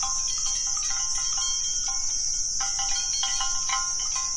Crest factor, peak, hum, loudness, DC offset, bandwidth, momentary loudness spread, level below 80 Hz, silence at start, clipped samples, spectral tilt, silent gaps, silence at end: 14 dB; -12 dBFS; none; -24 LUFS; under 0.1%; 11.5 kHz; 1 LU; -42 dBFS; 0 s; under 0.1%; 3 dB/octave; none; 0 s